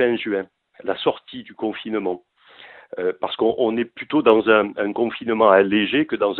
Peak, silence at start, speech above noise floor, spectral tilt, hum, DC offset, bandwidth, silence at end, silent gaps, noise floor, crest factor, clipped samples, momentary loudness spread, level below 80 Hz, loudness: 0 dBFS; 0 s; 26 dB; -8.5 dB/octave; none; under 0.1%; 4.4 kHz; 0 s; none; -46 dBFS; 20 dB; under 0.1%; 15 LU; -62 dBFS; -20 LUFS